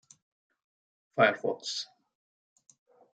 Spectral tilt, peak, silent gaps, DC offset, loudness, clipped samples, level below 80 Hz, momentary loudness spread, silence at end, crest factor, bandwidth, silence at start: -3.5 dB/octave; -10 dBFS; none; under 0.1%; -29 LUFS; under 0.1%; -84 dBFS; 14 LU; 1.3 s; 24 dB; 9.2 kHz; 1.15 s